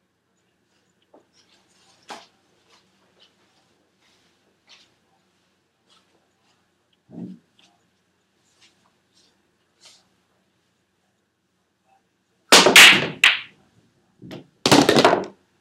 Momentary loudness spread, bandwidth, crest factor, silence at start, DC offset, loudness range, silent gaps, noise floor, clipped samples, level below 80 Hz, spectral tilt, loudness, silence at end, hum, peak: 31 LU; 16 kHz; 24 dB; 2.1 s; under 0.1%; 1 LU; none; -70 dBFS; under 0.1%; -66 dBFS; -1.5 dB/octave; -13 LUFS; 0.35 s; none; 0 dBFS